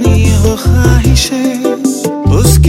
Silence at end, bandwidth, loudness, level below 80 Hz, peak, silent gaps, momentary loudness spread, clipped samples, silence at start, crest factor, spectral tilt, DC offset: 0 s; 16.5 kHz; -10 LUFS; -14 dBFS; 0 dBFS; none; 5 LU; 0.5%; 0 s; 8 dB; -5.5 dB/octave; under 0.1%